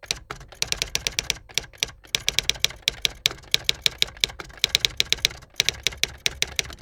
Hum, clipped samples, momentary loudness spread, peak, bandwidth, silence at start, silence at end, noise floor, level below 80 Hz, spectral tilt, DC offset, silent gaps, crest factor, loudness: none; under 0.1%; 7 LU; 0 dBFS; over 20 kHz; 0.1 s; 0.05 s; -40 dBFS; -46 dBFS; 0 dB/octave; under 0.1%; none; 26 dB; -24 LUFS